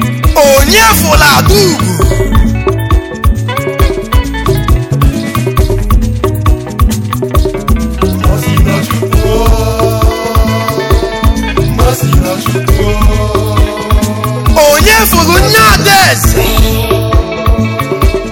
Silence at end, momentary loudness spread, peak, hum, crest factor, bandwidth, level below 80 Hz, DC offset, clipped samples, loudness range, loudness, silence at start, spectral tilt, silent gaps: 0 s; 8 LU; 0 dBFS; none; 8 dB; 17.5 kHz; -12 dBFS; under 0.1%; 0.7%; 5 LU; -9 LUFS; 0 s; -4.5 dB/octave; none